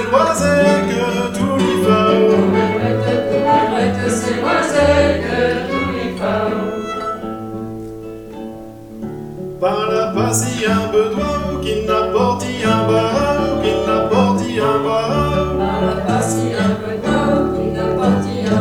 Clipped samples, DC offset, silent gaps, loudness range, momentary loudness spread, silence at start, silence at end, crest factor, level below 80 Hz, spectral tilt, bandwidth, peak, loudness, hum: under 0.1%; under 0.1%; none; 8 LU; 14 LU; 0 s; 0 s; 16 dB; -36 dBFS; -5.5 dB/octave; 17.5 kHz; 0 dBFS; -16 LUFS; none